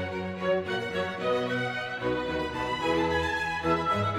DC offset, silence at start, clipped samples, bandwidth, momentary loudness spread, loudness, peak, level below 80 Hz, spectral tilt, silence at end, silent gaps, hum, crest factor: under 0.1%; 0 s; under 0.1%; 15 kHz; 5 LU; -29 LUFS; -14 dBFS; -50 dBFS; -5.5 dB/octave; 0 s; none; none; 14 dB